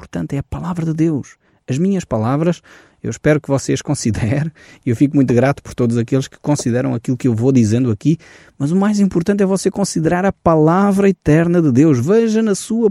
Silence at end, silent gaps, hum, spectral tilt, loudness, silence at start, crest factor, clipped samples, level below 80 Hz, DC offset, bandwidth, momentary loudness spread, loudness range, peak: 0 s; none; none; -7 dB/octave; -16 LUFS; 0 s; 14 dB; under 0.1%; -44 dBFS; under 0.1%; 12.5 kHz; 10 LU; 5 LU; -2 dBFS